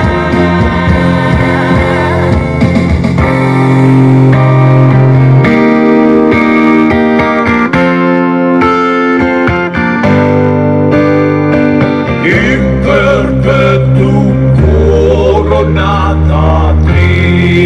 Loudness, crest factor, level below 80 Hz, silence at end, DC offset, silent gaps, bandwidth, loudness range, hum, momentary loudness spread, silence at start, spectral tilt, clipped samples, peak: -8 LUFS; 8 dB; -22 dBFS; 0 s; 0.3%; none; 9.2 kHz; 2 LU; none; 4 LU; 0 s; -8.5 dB/octave; 1%; 0 dBFS